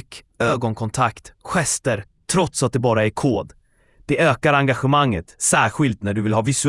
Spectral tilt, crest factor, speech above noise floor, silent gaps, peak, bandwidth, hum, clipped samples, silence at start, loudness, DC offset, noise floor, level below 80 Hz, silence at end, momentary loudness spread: -4.5 dB/octave; 18 dB; 31 dB; none; -2 dBFS; 12 kHz; none; under 0.1%; 0.1 s; -20 LUFS; under 0.1%; -51 dBFS; -48 dBFS; 0 s; 8 LU